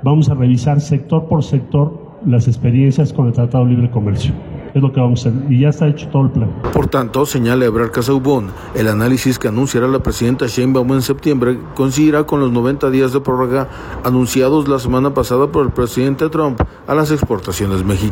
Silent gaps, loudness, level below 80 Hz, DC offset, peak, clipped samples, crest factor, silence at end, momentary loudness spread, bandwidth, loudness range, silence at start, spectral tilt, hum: none; -15 LUFS; -34 dBFS; under 0.1%; -2 dBFS; under 0.1%; 12 dB; 0 s; 5 LU; 16.5 kHz; 1 LU; 0 s; -7 dB/octave; none